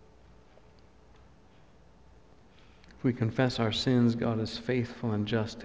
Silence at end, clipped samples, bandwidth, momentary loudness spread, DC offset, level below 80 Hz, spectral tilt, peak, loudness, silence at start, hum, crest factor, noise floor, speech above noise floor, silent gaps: 0 s; under 0.1%; 8 kHz; 7 LU; under 0.1%; -56 dBFS; -6.5 dB/octave; -14 dBFS; -30 LUFS; 2.9 s; none; 18 dB; -59 dBFS; 30 dB; none